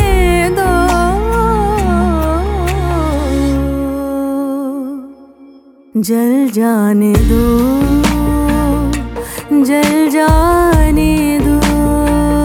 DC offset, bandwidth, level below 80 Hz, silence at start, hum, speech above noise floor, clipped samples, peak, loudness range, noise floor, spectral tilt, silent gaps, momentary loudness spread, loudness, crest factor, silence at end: under 0.1%; 17.5 kHz; -18 dBFS; 0 s; none; 31 dB; under 0.1%; 0 dBFS; 5 LU; -41 dBFS; -6.5 dB/octave; none; 7 LU; -13 LUFS; 12 dB; 0 s